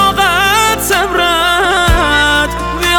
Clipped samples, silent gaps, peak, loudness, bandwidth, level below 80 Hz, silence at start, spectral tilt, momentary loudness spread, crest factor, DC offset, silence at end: under 0.1%; none; 0 dBFS; -10 LUFS; 19.5 kHz; -22 dBFS; 0 s; -2.5 dB/octave; 3 LU; 12 dB; 0.4%; 0 s